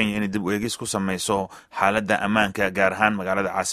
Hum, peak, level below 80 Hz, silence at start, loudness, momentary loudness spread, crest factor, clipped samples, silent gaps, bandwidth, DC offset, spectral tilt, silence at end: none; -2 dBFS; -54 dBFS; 0 s; -23 LUFS; 6 LU; 22 dB; under 0.1%; none; 15 kHz; under 0.1%; -4 dB/octave; 0 s